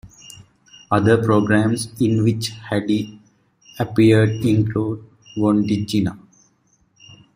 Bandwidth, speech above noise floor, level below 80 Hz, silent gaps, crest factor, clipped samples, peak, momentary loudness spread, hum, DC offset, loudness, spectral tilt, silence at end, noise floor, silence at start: 15.5 kHz; 44 dB; -52 dBFS; none; 18 dB; under 0.1%; -2 dBFS; 12 LU; none; under 0.1%; -19 LUFS; -6.5 dB/octave; 1.2 s; -61 dBFS; 0.05 s